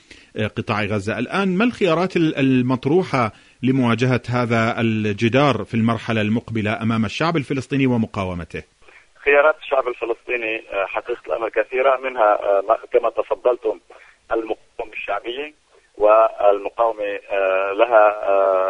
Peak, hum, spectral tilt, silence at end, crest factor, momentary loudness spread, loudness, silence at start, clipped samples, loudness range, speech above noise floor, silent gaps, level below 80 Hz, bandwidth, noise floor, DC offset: -2 dBFS; none; -7 dB/octave; 0 s; 18 dB; 11 LU; -19 LUFS; 0.35 s; under 0.1%; 3 LU; 30 dB; none; -54 dBFS; 10.5 kHz; -49 dBFS; under 0.1%